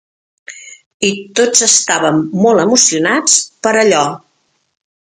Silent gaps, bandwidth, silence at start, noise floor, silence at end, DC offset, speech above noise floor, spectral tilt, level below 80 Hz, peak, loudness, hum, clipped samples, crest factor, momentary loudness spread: 0.86-1.00 s; 16 kHz; 0.5 s; -62 dBFS; 0.85 s; under 0.1%; 50 dB; -2 dB/octave; -60 dBFS; 0 dBFS; -11 LUFS; none; under 0.1%; 14 dB; 14 LU